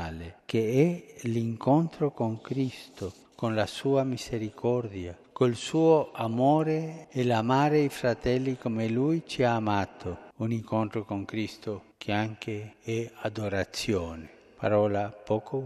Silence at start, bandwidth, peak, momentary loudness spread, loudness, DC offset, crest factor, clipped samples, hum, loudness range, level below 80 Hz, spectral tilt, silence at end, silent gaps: 0 s; 13 kHz; -10 dBFS; 13 LU; -29 LUFS; under 0.1%; 18 dB; under 0.1%; none; 7 LU; -56 dBFS; -6.5 dB/octave; 0 s; none